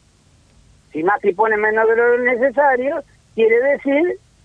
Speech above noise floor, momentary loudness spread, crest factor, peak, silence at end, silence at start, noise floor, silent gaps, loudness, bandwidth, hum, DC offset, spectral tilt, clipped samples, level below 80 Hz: 37 dB; 8 LU; 14 dB; -4 dBFS; 0.3 s; 0.95 s; -53 dBFS; none; -16 LUFS; 3.9 kHz; none; under 0.1%; -6.5 dB/octave; under 0.1%; -56 dBFS